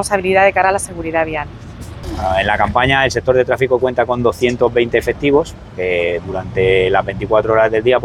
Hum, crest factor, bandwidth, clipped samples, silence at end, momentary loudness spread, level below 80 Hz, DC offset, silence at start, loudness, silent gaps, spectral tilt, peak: none; 14 dB; 14.5 kHz; under 0.1%; 0 s; 10 LU; -36 dBFS; under 0.1%; 0 s; -15 LUFS; none; -5 dB/octave; 0 dBFS